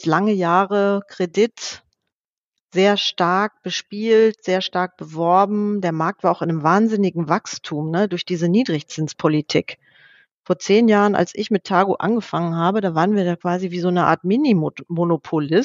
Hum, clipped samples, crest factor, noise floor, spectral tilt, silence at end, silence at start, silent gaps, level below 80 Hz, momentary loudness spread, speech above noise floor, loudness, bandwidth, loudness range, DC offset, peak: none; under 0.1%; 18 dB; -84 dBFS; -6 dB/octave; 0 s; 0 s; 2.20-2.51 s, 2.60-2.68 s, 10.32-10.43 s; -68 dBFS; 8 LU; 65 dB; -19 LUFS; 7.6 kHz; 2 LU; under 0.1%; 0 dBFS